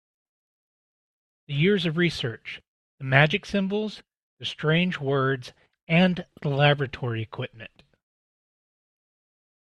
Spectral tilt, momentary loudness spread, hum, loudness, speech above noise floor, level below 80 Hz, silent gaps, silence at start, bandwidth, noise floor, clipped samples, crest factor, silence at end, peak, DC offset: -6.5 dB/octave; 17 LU; none; -24 LUFS; over 66 dB; -60 dBFS; 2.68-2.98 s, 4.23-4.37 s, 5.83-5.87 s; 1.5 s; 10 kHz; under -90 dBFS; under 0.1%; 26 dB; 2.1 s; -2 dBFS; under 0.1%